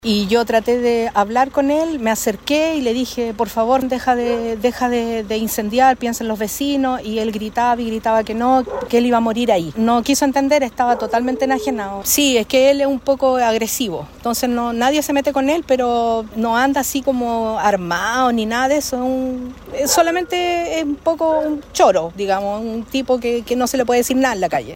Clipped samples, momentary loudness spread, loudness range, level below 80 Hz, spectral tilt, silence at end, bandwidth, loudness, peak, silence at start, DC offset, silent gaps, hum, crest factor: under 0.1%; 6 LU; 2 LU; -44 dBFS; -3.5 dB/octave; 0 s; 16.5 kHz; -17 LUFS; -2 dBFS; 0.05 s; under 0.1%; none; none; 16 dB